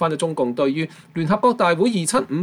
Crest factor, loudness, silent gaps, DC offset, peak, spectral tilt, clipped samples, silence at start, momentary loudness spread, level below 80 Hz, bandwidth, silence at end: 14 dB; -20 LUFS; none; under 0.1%; -6 dBFS; -5 dB/octave; under 0.1%; 0 s; 9 LU; -60 dBFS; 15.5 kHz; 0 s